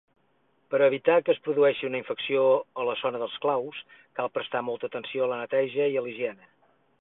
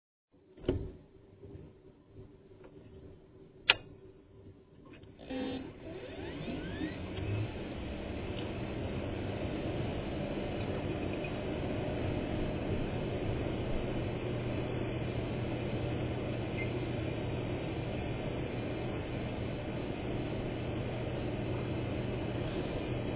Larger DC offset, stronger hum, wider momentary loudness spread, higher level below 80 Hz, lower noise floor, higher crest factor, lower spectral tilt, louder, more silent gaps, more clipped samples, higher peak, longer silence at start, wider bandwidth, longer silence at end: neither; neither; second, 11 LU vs 18 LU; second, -74 dBFS vs -48 dBFS; first, -69 dBFS vs -57 dBFS; second, 18 dB vs 32 dB; first, -9 dB/octave vs -5 dB/octave; first, -27 LUFS vs -37 LUFS; neither; neither; about the same, -8 dBFS vs -6 dBFS; first, 0.7 s vs 0.5 s; about the same, 4 kHz vs 4 kHz; first, 0.65 s vs 0 s